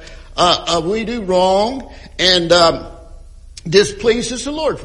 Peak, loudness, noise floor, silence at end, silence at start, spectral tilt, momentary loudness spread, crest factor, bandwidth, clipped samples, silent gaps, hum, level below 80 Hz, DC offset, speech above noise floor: 0 dBFS; -15 LUFS; -37 dBFS; 0 s; 0 s; -3.5 dB/octave; 15 LU; 16 dB; 12 kHz; under 0.1%; none; none; -36 dBFS; under 0.1%; 21 dB